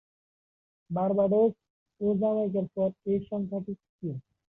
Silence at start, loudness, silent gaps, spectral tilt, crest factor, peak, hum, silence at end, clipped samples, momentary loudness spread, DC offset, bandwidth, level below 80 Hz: 0.9 s; -29 LUFS; 1.70-1.86 s, 3.89-3.99 s; -12.5 dB/octave; 14 dB; -14 dBFS; none; 0.3 s; under 0.1%; 14 LU; under 0.1%; 3.8 kHz; -66 dBFS